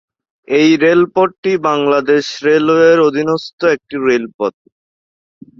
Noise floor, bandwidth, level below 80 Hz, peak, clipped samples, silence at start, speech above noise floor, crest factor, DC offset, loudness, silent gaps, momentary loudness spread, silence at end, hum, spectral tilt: under -90 dBFS; 7.4 kHz; -58 dBFS; 0 dBFS; under 0.1%; 0.5 s; over 77 dB; 12 dB; under 0.1%; -13 LUFS; 1.38-1.43 s, 3.53-3.58 s, 4.34-4.39 s; 8 LU; 1.1 s; none; -5.5 dB/octave